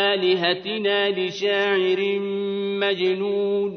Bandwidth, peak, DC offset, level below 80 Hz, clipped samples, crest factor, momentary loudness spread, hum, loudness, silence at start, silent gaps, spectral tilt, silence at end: 6.6 kHz; -6 dBFS; under 0.1%; -70 dBFS; under 0.1%; 16 dB; 5 LU; none; -22 LUFS; 0 s; none; -5 dB/octave; 0 s